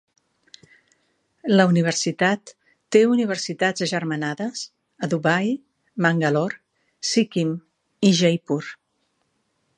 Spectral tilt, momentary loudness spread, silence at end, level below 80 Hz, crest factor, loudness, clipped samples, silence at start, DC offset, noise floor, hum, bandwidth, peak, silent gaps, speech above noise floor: -5 dB/octave; 14 LU; 1.05 s; -70 dBFS; 20 dB; -21 LUFS; under 0.1%; 1.45 s; under 0.1%; -71 dBFS; none; 10.5 kHz; -2 dBFS; none; 50 dB